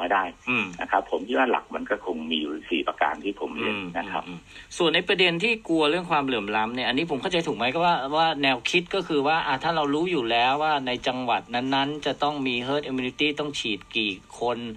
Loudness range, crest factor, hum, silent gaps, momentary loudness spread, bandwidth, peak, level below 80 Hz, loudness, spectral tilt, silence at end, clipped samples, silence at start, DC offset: 4 LU; 18 dB; none; none; 8 LU; 10 kHz; -6 dBFS; -58 dBFS; -25 LUFS; -4.5 dB/octave; 0 s; under 0.1%; 0 s; under 0.1%